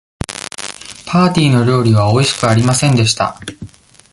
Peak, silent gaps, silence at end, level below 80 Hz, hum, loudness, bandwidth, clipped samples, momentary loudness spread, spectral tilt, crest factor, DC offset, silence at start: 0 dBFS; none; 0.45 s; -40 dBFS; none; -13 LUFS; 11.5 kHz; under 0.1%; 15 LU; -5 dB/octave; 14 dB; under 0.1%; 0.3 s